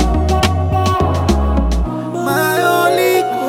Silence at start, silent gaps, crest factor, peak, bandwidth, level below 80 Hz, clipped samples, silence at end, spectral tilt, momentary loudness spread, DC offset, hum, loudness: 0 s; none; 14 dB; 0 dBFS; 17 kHz; -20 dBFS; under 0.1%; 0 s; -5.5 dB/octave; 6 LU; under 0.1%; none; -15 LUFS